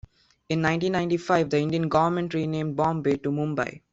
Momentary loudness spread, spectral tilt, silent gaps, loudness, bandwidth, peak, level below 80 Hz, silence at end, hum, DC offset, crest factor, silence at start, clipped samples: 5 LU; -7 dB/octave; none; -25 LUFS; 7.8 kHz; -8 dBFS; -56 dBFS; 0.15 s; none; under 0.1%; 18 dB; 0.5 s; under 0.1%